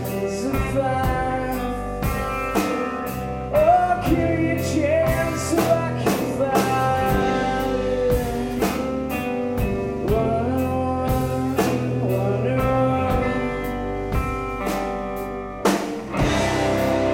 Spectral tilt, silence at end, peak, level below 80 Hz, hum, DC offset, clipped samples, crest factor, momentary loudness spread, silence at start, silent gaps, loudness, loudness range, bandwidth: -6 dB/octave; 0 s; -6 dBFS; -34 dBFS; none; under 0.1%; under 0.1%; 16 dB; 6 LU; 0 s; none; -22 LUFS; 3 LU; 16.5 kHz